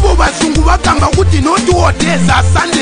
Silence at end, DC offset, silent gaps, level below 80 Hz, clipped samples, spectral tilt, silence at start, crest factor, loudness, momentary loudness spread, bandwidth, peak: 0 s; under 0.1%; none; -16 dBFS; under 0.1%; -5 dB/octave; 0 s; 10 dB; -10 LUFS; 1 LU; 10 kHz; 0 dBFS